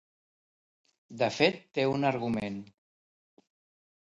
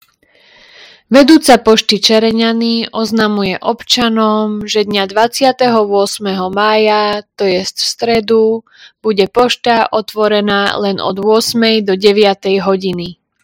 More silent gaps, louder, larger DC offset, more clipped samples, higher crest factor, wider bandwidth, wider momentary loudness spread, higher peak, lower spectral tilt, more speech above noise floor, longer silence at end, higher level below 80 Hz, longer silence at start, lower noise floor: neither; second, -29 LUFS vs -12 LUFS; neither; second, under 0.1% vs 0.9%; first, 22 dB vs 12 dB; second, 11 kHz vs 17 kHz; first, 14 LU vs 7 LU; second, -10 dBFS vs 0 dBFS; first, -5.5 dB/octave vs -4 dB/octave; first, over 61 dB vs 38 dB; first, 1.5 s vs 0.3 s; second, -68 dBFS vs -48 dBFS; about the same, 1.1 s vs 1.1 s; first, under -90 dBFS vs -49 dBFS